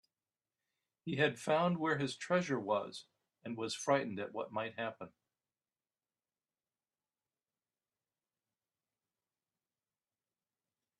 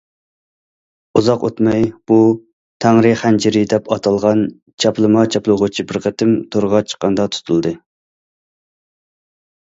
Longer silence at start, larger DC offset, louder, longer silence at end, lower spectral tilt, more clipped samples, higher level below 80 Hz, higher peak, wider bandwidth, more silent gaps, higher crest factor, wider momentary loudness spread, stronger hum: about the same, 1.05 s vs 1.15 s; neither; second, -36 LUFS vs -15 LUFS; first, 5.9 s vs 1.85 s; about the same, -5 dB/octave vs -6 dB/octave; neither; second, -82 dBFS vs -52 dBFS; second, -16 dBFS vs 0 dBFS; first, 12.5 kHz vs 8 kHz; second, none vs 2.53-2.80 s, 4.62-4.66 s, 4.74-4.78 s; first, 24 dB vs 16 dB; first, 17 LU vs 6 LU; neither